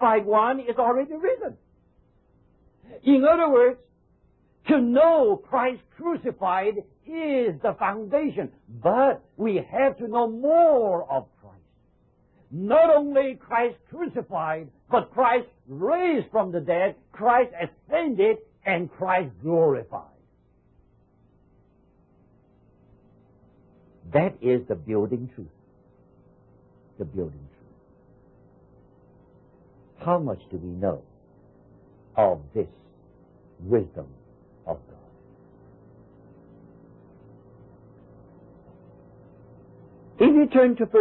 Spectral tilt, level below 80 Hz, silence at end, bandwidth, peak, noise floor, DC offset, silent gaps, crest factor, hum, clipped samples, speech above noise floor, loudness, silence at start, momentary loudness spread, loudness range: -11 dB/octave; -58 dBFS; 0 s; 4.2 kHz; -6 dBFS; -62 dBFS; under 0.1%; none; 18 dB; none; under 0.1%; 40 dB; -23 LUFS; 0 s; 18 LU; 12 LU